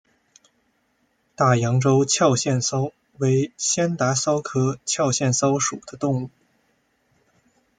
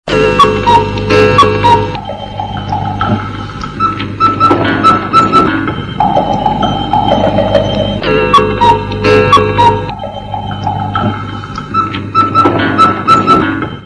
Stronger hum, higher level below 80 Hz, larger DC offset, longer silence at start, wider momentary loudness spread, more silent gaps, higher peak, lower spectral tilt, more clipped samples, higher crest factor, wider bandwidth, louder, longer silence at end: neither; second, -62 dBFS vs -30 dBFS; second, under 0.1% vs 0.1%; first, 1.4 s vs 0.05 s; second, 8 LU vs 13 LU; neither; second, -4 dBFS vs 0 dBFS; second, -4.5 dB/octave vs -6 dB/octave; second, under 0.1% vs 1%; first, 20 dB vs 10 dB; second, 9.6 kHz vs 12 kHz; second, -21 LUFS vs -10 LUFS; first, 1.5 s vs 0 s